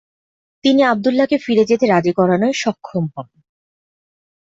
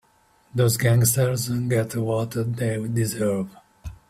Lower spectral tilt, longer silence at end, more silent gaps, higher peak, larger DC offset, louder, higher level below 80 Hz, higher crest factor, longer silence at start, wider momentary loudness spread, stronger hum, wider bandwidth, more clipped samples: about the same, -6 dB/octave vs -5.5 dB/octave; first, 1.25 s vs 0.15 s; neither; first, -2 dBFS vs -6 dBFS; neither; first, -16 LUFS vs -23 LUFS; second, -60 dBFS vs -50 dBFS; about the same, 14 dB vs 18 dB; about the same, 0.65 s vs 0.55 s; second, 9 LU vs 12 LU; neither; second, 8 kHz vs 16 kHz; neither